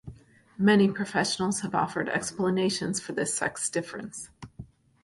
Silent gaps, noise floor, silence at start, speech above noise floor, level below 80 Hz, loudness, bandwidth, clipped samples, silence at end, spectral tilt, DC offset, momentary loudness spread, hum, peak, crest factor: none; -52 dBFS; 0.05 s; 25 dB; -60 dBFS; -27 LUFS; 11.5 kHz; under 0.1%; 0.4 s; -4 dB/octave; under 0.1%; 17 LU; none; -10 dBFS; 18 dB